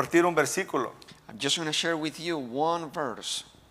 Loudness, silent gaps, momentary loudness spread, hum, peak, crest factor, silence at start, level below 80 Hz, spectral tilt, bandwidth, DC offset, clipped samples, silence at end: -28 LUFS; none; 10 LU; none; -8 dBFS; 22 dB; 0 s; -68 dBFS; -3 dB/octave; 16 kHz; under 0.1%; under 0.1%; 0.25 s